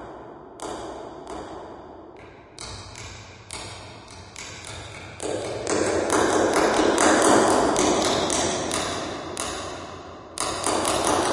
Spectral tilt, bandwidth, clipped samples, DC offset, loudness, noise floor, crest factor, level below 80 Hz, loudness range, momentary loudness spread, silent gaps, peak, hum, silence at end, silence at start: -3 dB/octave; 11.5 kHz; under 0.1%; under 0.1%; -22 LUFS; -45 dBFS; 24 dB; -50 dBFS; 18 LU; 22 LU; none; -2 dBFS; none; 0 s; 0 s